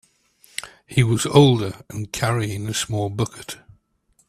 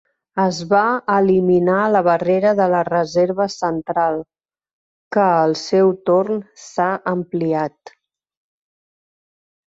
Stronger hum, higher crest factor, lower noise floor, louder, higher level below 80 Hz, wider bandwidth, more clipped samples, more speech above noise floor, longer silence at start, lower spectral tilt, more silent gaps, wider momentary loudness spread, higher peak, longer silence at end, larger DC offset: neither; first, 22 dB vs 16 dB; second, -64 dBFS vs under -90 dBFS; about the same, -20 LUFS vs -18 LUFS; first, -50 dBFS vs -60 dBFS; first, 14.5 kHz vs 7.8 kHz; neither; second, 44 dB vs over 73 dB; first, 0.6 s vs 0.35 s; about the same, -5.5 dB/octave vs -6.5 dB/octave; second, none vs 4.73-5.11 s; first, 19 LU vs 7 LU; first, 0 dBFS vs -4 dBFS; second, 0.75 s vs 2.05 s; neither